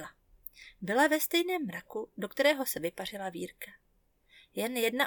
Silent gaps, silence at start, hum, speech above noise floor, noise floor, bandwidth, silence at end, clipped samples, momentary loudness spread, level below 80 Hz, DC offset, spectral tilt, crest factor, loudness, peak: none; 0 s; none; 39 dB; -70 dBFS; 19 kHz; 0 s; under 0.1%; 21 LU; -70 dBFS; under 0.1%; -3 dB/octave; 20 dB; -31 LUFS; -14 dBFS